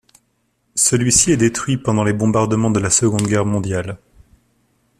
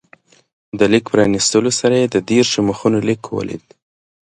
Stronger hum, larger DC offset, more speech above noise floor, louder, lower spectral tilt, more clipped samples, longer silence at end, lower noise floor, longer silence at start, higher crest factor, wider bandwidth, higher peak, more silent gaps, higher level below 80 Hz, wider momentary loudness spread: neither; neither; first, 49 dB vs 35 dB; about the same, -16 LUFS vs -15 LUFS; about the same, -4.5 dB/octave vs -4.5 dB/octave; neither; first, 1.05 s vs 0.75 s; first, -65 dBFS vs -50 dBFS; about the same, 0.75 s vs 0.75 s; about the same, 18 dB vs 16 dB; first, 15 kHz vs 11.5 kHz; about the same, 0 dBFS vs 0 dBFS; neither; first, -44 dBFS vs -50 dBFS; about the same, 11 LU vs 11 LU